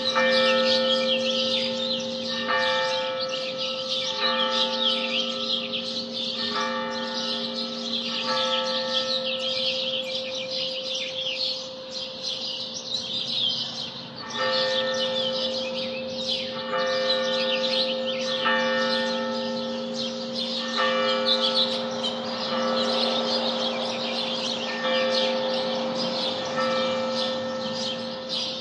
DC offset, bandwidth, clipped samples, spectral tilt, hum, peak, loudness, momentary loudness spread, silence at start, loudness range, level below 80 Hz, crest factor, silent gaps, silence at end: under 0.1%; 10.5 kHz; under 0.1%; -2.5 dB/octave; none; -8 dBFS; -25 LUFS; 7 LU; 0 s; 3 LU; -72 dBFS; 18 dB; none; 0 s